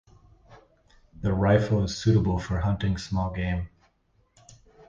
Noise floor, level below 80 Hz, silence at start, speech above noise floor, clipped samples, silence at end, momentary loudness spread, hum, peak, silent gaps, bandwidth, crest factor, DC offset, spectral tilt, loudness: -67 dBFS; -40 dBFS; 0.5 s; 43 dB; under 0.1%; 0.35 s; 9 LU; none; -8 dBFS; none; 7.6 kHz; 20 dB; under 0.1%; -7 dB/octave; -26 LUFS